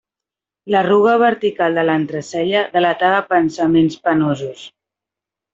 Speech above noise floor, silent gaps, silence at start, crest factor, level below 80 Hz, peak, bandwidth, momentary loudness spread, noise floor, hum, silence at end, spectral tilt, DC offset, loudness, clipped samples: 71 dB; none; 0.65 s; 14 dB; -58 dBFS; -2 dBFS; 7.8 kHz; 8 LU; -87 dBFS; none; 0.85 s; -6 dB/octave; under 0.1%; -16 LUFS; under 0.1%